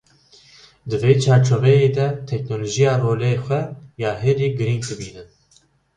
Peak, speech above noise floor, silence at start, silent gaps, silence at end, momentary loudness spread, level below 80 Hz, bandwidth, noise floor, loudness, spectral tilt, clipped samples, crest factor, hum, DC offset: -2 dBFS; 40 dB; 0.85 s; none; 0.7 s; 14 LU; -52 dBFS; 9.6 kHz; -58 dBFS; -19 LUFS; -6.5 dB/octave; under 0.1%; 18 dB; none; under 0.1%